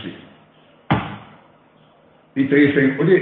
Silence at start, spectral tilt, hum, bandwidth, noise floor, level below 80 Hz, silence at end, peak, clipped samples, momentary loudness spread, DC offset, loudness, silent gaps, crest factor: 0 s; -10 dB/octave; none; 4.2 kHz; -53 dBFS; -50 dBFS; 0 s; -4 dBFS; under 0.1%; 19 LU; under 0.1%; -18 LUFS; none; 16 dB